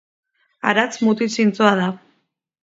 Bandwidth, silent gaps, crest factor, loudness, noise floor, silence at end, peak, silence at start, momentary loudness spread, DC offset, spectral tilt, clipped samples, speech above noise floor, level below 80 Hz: 7.8 kHz; none; 20 dB; -18 LUFS; -69 dBFS; 0.65 s; 0 dBFS; 0.65 s; 8 LU; under 0.1%; -5 dB/octave; under 0.1%; 52 dB; -66 dBFS